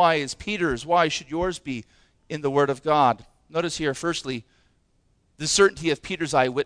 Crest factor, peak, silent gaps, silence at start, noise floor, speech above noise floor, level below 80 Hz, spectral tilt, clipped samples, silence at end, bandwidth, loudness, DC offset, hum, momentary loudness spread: 20 dB; -6 dBFS; none; 0 s; -65 dBFS; 42 dB; -50 dBFS; -3.5 dB/octave; under 0.1%; 0 s; 10.5 kHz; -24 LUFS; under 0.1%; none; 13 LU